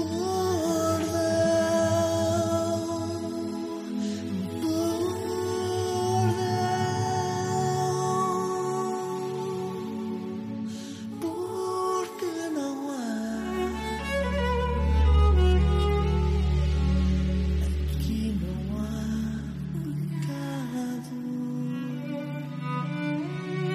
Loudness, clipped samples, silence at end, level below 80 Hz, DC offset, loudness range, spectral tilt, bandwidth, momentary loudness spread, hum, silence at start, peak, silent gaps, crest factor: -28 LUFS; under 0.1%; 0 s; -32 dBFS; under 0.1%; 7 LU; -6 dB/octave; 15 kHz; 9 LU; none; 0 s; -12 dBFS; none; 16 dB